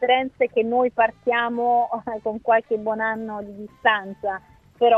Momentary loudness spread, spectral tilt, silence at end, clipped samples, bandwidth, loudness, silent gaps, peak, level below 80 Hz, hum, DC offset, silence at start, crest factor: 9 LU; -6.5 dB/octave; 0 s; under 0.1%; 4.1 kHz; -22 LUFS; none; -4 dBFS; -60 dBFS; none; under 0.1%; 0 s; 18 dB